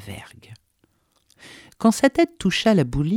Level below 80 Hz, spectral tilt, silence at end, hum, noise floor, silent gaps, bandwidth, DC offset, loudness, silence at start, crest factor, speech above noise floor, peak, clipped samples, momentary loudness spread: -44 dBFS; -5.5 dB/octave; 0 s; none; -65 dBFS; none; 16.5 kHz; under 0.1%; -20 LUFS; 0 s; 18 dB; 46 dB; -4 dBFS; under 0.1%; 13 LU